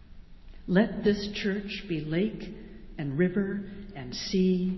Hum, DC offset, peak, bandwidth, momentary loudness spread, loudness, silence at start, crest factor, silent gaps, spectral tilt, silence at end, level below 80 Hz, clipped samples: none; under 0.1%; -10 dBFS; 6 kHz; 16 LU; -29 LUFS; 0 s; 20 dB; none; -6.5 dB/octave; 0 s; -50 dBFS; under 0.1%